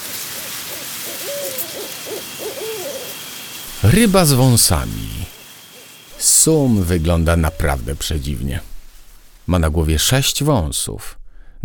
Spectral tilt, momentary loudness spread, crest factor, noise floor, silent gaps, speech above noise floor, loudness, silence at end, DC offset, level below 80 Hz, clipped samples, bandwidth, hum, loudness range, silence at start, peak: -4 dB/octave; 18 LU; 18 dB; -41 dBFS; none; 25 dB; -17 LUFS; 0 s; under 0.1%; -30 dBFS; under 0.1%; over 20 kHz; none; 9 LU; 0 s; 0 dBFS